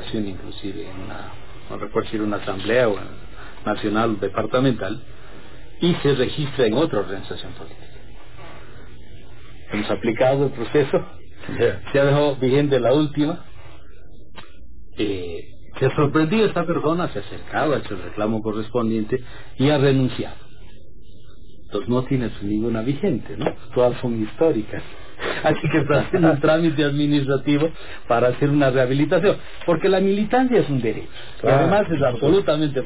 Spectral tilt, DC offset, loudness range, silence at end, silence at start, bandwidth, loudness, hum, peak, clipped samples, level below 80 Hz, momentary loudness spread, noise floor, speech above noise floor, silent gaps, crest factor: -11 dB/octave; 3%; 6 LU; 0 s; 0 s; 4 kHz; -21 LUFS; none; -6 dBFS; under 0.1%; -46 dBFS; 16 LU; -46 dBFS; 25 dB; none; 16 dB